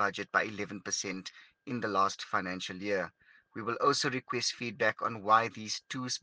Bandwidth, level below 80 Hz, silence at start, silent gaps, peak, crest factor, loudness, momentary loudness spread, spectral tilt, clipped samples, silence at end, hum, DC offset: 10 kHz; -76 dBFS; 0 s; none; -12 dBFS; 22 dB; -32 LUFS; 13 LU; -3 dB/octave; under 0.1%; 0.05 s; none; under 0.1%